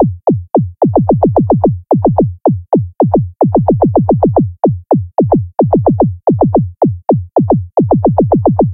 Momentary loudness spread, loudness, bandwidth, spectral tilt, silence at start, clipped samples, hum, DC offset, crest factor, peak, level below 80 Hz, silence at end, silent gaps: 4 LU; -12 LUFS; 2.1 kHz; -15.5 dB/octave; 0 s; under 0.1%; none; under 0.1%; 12 dB; 0 dBFS; -34 dBFS; 0 s; none